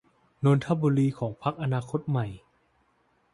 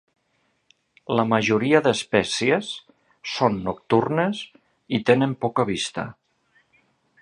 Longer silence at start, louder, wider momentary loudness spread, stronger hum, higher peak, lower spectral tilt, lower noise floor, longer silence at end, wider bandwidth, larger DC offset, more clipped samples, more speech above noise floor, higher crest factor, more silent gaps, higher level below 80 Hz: second, 0.4 s vs 1.1 s; second, -27 LUFS vs -22 LUFS; second, 7 LU vs 15 LU; neither; second, -10 dBFS vs -2 dBFS; first, -8.5 dB/octave vs -5 dB/octave; about the same, -68 dBFS vs -69 dBFS; second, 0.95 s vs 1.1 s; about the same, 11 kHz vs 11.5 kHz; neither; neither; second, 42 dB vs 47 dB; about the same, 18 dB vs 22 dB; neither; about the same, -60 dBFS vs -58 dBFS